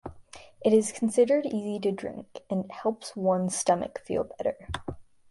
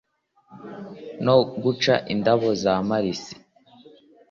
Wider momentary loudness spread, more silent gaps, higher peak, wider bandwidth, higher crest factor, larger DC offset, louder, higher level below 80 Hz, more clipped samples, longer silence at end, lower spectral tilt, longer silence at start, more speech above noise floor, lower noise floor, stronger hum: second, 14 LU vs 20 LU; neither; second, -10 dBFS vs -4 dBFS; first, 11.5 kHz vs 7.4 kHz; about the same, 18 dB vs 20 dB; neither; second, -28 LUFS vs -22 LUFS; first, -54 dBFS vs -60 dBFS; neither; second, 0.3 s vs 0.95 s; about the same, -5 dB/octave vs -6 dB/octave; second, 0.05 s vs 0.5 s; second, 22 dB vs 37 dB; second, -50 dBFS vs -59 dBFS; neither